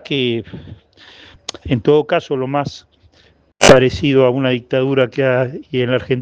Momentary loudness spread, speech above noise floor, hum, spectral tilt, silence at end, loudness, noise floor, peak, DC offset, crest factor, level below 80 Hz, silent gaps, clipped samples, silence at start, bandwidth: 18 LU; 37 dB; none; -5 dB/octave; 0 s; -15 LUFS; -53 dBFS; 0 dBFS; under 0.1%; 16 dB; -42 dBFS; none; 0.3%; 0.1 s; 10.5 kHz